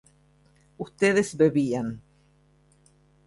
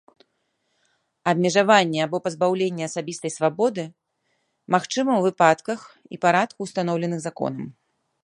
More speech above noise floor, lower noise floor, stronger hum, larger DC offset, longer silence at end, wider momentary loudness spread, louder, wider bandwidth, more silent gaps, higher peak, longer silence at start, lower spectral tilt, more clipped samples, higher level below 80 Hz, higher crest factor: second, 38 dB vs 51 dB; second, -61 dBFS vs -73 dBFS; neither; neither; first, 1.3 s vs 0.55 s; first, 18 LU vs 13 LU; about the same, -24 LUFS vs -22 LUFS; about the same, 11.5 kHz vs 11.5 kHz; neither; second, -8 dBFS vs -2 dBFS; second, 0.8 s vs 1.25 s; about the same, -6 dB/octave vs -5 dB/octave; neither; first, -62 dBFS vs -72 dBFS; about the same, 20 dB vs 22 dB